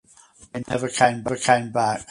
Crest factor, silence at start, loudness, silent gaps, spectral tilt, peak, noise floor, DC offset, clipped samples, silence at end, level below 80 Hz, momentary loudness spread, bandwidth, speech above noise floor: 22 dB; 0.55 s; -22 LUFS; none; -4 dB/octave; 0 dBFS; -52 dBFS; under 0.1%; under 0.1%; 0.05 s; -56 dBFS; 12 LU; 11.5 kHz; 30 dB